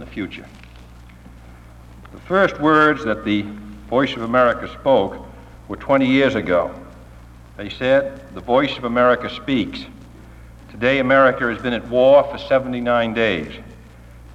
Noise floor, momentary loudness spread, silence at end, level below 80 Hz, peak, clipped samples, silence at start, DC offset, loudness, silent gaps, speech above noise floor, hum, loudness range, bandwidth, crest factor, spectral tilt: -41 dBFS; 19 LU; 0 s; -44 dBFS; -2 dBFS; under 0.1%; 0 s; under 0.1%; -18 LUFS; none; 24 dB; none; 3 LU; 9 kHz; 16 dB; -6.5 dB/octave